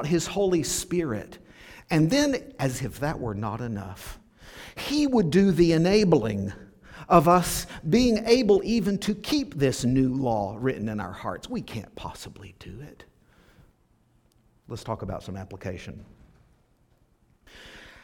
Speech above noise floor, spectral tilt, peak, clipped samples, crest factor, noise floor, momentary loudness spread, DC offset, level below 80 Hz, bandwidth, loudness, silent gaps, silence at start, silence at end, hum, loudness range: 39 dB; -5.5 dB/octave; -4 dBFS; under 0.1%; 22 dB; -64 dBFS; 23 LU; under 0.1%; -48 dBFS; 19 kHz; -25 LUFS; none; 0 s; 0.15 s; none; 17 LU